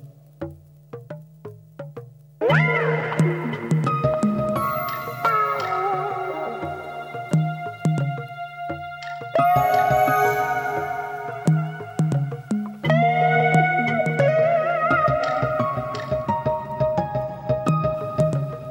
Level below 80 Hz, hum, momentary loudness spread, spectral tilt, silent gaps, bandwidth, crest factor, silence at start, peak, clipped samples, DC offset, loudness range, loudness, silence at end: -50 dBFS; none; 16 LU; -7 dB/octave; none; 19.5 kHz; 16 dB; 0 s; -6 dBFS; under 0.1%; under 0.1%; 5 LU; -22 LUFS; 0 s